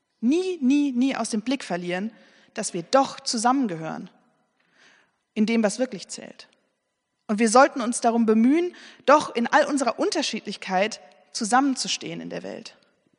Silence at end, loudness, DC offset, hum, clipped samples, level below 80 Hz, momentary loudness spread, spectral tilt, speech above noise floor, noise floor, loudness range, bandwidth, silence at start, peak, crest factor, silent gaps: 0.5 s; -23 LUFS; under 0.1%; none; under 0.1%; -78 dBFS; 16 LU; -4 dB/octave; 54 dB; -77 dBFS; 7 LU; 10.5 kHz; 0.2 s; -2 dBFS; 22 dB; none